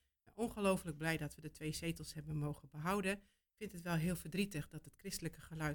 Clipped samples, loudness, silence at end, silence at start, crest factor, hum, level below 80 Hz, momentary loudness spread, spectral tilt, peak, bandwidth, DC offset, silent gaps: under 0.1%; -42 LUFS; 0 s; 0.25 s; 20 dB; none; -62 dBFS; 10 LU; -5.5 dB/octave; -22 dBFS; 19 kHz; under 0.1%; none